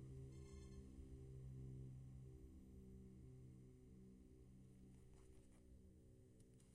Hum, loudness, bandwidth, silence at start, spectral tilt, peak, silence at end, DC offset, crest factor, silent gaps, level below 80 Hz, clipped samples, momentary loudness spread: none; -62 LUFS; 13.5 kHz; 0 s; -7.5 dB/octave; -46 dBFS; 0 s; under 0.1%; 14 dB; none; -66 dBFS; under 0.1%; 11 LU